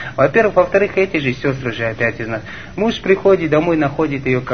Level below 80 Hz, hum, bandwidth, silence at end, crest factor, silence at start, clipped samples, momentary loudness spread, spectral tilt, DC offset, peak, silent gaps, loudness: -42 dBFS; none; 6.6 kHz; 0 s; 16 dB; 0 s; under 0.1%; 8 LU; -7 dB/octave; 0.9%; 0 dBFS; none; -16 LUFS